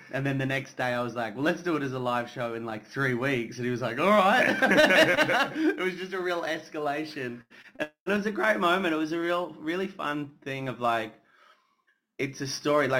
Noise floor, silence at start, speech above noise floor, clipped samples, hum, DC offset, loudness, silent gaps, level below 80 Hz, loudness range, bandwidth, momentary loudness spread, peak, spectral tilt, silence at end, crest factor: -72 dBFS; 0 s; 45 dB; under 0.1%; none; under 0.1%; -27 LUFS; 8.00-8.06 s; -64 dBFS; 8 LU; 16.5 kHz; 14 LU; -8 dBFS; -5 dB/octave; 0 s; 18 dB